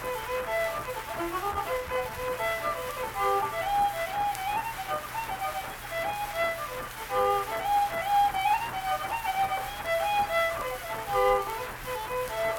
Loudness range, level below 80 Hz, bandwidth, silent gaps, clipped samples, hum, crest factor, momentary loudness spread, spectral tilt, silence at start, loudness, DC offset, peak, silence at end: 3 LU; -50 dBFS; 19 kHz; none; under 0.1%; none; 18 dB; 8 LU; -3 dB/octave; 0 s; -29 LUFS; under 0.1%; -12 dBFS; 0 s